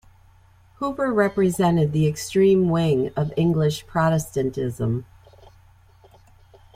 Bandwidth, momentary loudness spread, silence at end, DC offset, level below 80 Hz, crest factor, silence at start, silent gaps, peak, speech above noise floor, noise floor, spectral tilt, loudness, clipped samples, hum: 16 kHz; 8 LU; 1.7 s; under 0.1%; -50 dBFS; 16 dB; 0.8 s; none; -6 dBFS; 33 dB; -53 dBFS; -7 dB/octave; -22 LUFS; under 0.1%; none